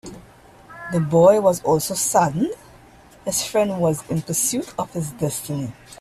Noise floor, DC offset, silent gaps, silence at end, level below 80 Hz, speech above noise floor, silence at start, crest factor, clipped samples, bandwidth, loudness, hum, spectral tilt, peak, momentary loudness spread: -48 dBFS; under 0.1%; none; 0.05 s; -52 dBFS; 28 dB; 0.05 s; 18 dB; under 0.1%; 16 kHz; -20 LUFS; none; -5 dB/octave; -2 dBFS; 15 LU